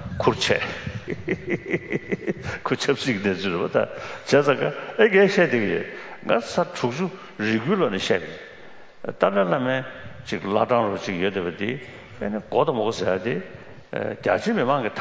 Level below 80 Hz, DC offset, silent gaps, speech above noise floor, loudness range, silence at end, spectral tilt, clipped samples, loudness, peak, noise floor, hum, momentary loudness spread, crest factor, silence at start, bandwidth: -52 dBFS; under 0.1%; none; 21 dB; 4 LU; 0 s; -5.5 dB/octave; under 0.1%; -23 LUFS; -2 dBFS; -44 dBFS; none; 13 LU; 22 dB; 0 s; 8 kHz